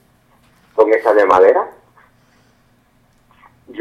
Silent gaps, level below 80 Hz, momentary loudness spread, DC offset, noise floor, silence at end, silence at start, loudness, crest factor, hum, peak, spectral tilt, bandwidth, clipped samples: none; -58 dBFS; 17 LU; under 0.1%; -55 dBFS; 0 s; 0.75 s; -13 LUFS; 18 dB; none; 0 dBFS; -5.5 dB/octave; 9.4 kHz; under 0.1%